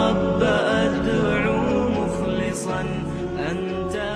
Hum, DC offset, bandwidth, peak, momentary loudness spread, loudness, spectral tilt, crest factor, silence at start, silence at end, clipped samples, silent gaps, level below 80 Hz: none; under 0.1%; 13 kHz; -6 dBFS; 7 LU; -22 LUFS; -6 dB/octave; 16 dB; 0 s; 0 s; under 0.1%; none; -40 dBFS